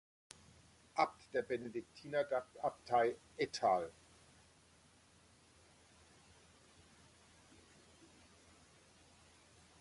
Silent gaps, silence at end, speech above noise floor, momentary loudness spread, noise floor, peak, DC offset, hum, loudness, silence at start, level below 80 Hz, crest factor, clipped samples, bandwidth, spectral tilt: none; 5.9 s; 29 dB; 28 LU; -68 dBFS; -20 dBFS; under 0.1%; none; -39 LUFS; 0.95 s; -74 dBFS; 24 dB; under 0.1%; 11.5 kHz; -4.5 dB/octave